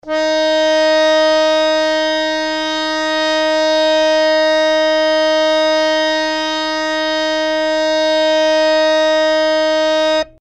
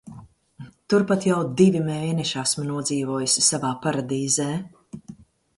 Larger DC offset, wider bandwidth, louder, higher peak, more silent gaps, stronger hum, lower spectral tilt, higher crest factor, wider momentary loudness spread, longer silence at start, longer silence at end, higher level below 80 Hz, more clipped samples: neither; second, 8.6 kHz vs 11.5 kHz; first, -14 LUFS vs -22 LUFS; about the same, -4 dBFS vs -2 dBFS; neither; neither; second, -1.5 dB/octave vs -4 dB/octave; second, 12 dB vs 20 dB; second, 5 LU vs 13 LU; about the same, 0.05 s vs 0.05 s; second, 0.15 s vs 0.45 s; first, -50 dBFS vs -60 dBFS; neither